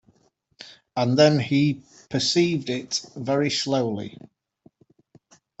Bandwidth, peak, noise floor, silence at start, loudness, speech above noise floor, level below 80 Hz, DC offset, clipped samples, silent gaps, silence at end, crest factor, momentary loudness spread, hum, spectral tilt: 8.2 kHz; -4 dBFS; -64 dBFS; 0.6 s; -23 LUFS; 42 dB; -64 dBFS; under 0.1%; under 0.1%; none; 1.5 s; 20 dB; 18 LU; none; -5 dB/octave